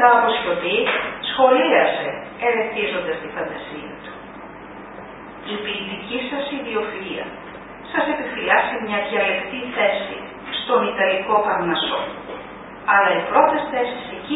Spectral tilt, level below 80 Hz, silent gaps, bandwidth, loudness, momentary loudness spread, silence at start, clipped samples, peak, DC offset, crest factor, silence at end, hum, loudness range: -9 dB/octave; -54 dBFS; none; 4 kHz; -20 LUFS; 20 LU; 0 s; under 0.1%; -2 dBFS; under 0.1%; 20 dB; 0 s; none; 9 LU